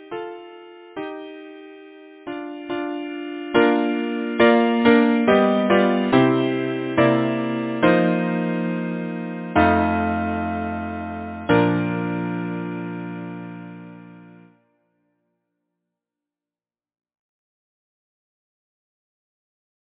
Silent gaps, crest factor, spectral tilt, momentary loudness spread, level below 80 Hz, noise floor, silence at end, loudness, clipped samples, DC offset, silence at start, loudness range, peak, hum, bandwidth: none; 22 dB; -10.5 dB/octave; 19 LU; -46 dBFS; under -90 dBFS; 5.55 s; -20 LUFS; under 0.1%; under 0.1%; 0 s; 15 LU; -2 dBFS; none; 4 kHz